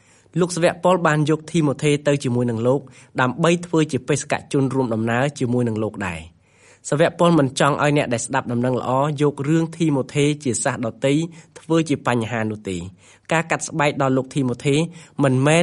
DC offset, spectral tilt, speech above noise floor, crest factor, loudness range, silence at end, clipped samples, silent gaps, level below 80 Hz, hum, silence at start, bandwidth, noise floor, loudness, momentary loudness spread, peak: under 0.1%; -5.5 dB/octave; 33 dB; 18 dB; 3 LU; 0 s; under 0.1%; none; -56 dBFS; none; 0.35 s; 11.5 kHz; -53 dBFS; -20 LUFS; 8 LU; -2 dBFS